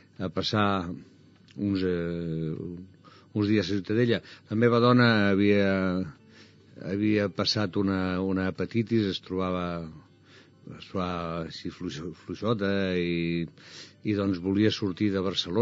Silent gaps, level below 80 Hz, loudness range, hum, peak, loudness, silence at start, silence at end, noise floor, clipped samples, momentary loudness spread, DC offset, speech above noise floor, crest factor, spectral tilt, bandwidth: none; -60 dBFS; 8 LU; none; -8 dBFS; -27 LUFS; 0.2 s; 0 s; -55 dBFS; under 0.1%; 16 LU; under 0.1%; 28 dB; 20 dB; -5 dB/octave; 7.6 kHz